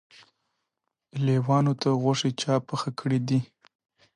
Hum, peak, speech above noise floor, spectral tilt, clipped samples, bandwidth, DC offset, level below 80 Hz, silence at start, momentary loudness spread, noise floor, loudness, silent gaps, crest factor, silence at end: none; -12 dBFS; 58 dB; -6.5 dB/octave; under 0.1%; 10.5 kHz; under 0.1%; -68 dBFS; 1.15 s; 8 LU; -82 dBFS; -26 LUFS; none; 16 dB; 0.7 s